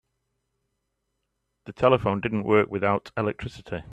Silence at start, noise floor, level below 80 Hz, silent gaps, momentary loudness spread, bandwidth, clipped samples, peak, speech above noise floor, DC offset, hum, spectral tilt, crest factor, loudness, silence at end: 1.65 s; -78 dBFS; -54 dBFS; none; 15 LU; 8.8 kHz; under 0.1%; -4 dBFS; 54 dB; under 0.1%; none; -7.5 dB/octave; 22 dB; -24 LUFS; 0 s